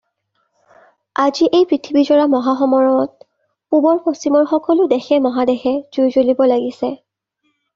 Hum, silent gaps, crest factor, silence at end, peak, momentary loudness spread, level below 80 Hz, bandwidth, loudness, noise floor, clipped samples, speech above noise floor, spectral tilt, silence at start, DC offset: none; none; 14 dB; 0.8 s; -2 dBFS; 7 LU; -60 dBFS; 7.4 kHz; -15 LUFS; -68 dBFS; under 0.1%; 54 dB; -5 dB/octave; 1.2 s; under 0.1%